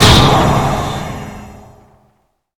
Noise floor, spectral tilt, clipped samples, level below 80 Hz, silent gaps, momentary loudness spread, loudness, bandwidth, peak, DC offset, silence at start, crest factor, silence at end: -60 dBFS; -4.5 dB/octave; 0.5%; -24 dBFS; none; 22 LU; -12 LUFS; over 20 kHz; 0 dBFS; under 0.1%; 0 s; 14 dB; 1 s